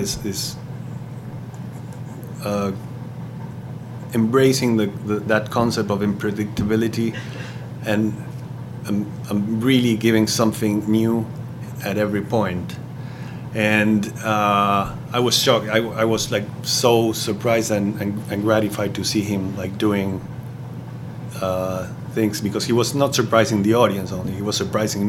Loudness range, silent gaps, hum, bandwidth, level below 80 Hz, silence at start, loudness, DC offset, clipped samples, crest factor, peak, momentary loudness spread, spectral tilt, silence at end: 6 LU; none; none; 16.5 kHz; -50 dBFS; 0 s; -20 LUFS; under 0.1%; under 0.1%; 20 dB; 0 dBFS; 16 LU; -5 dB/octave; 0 s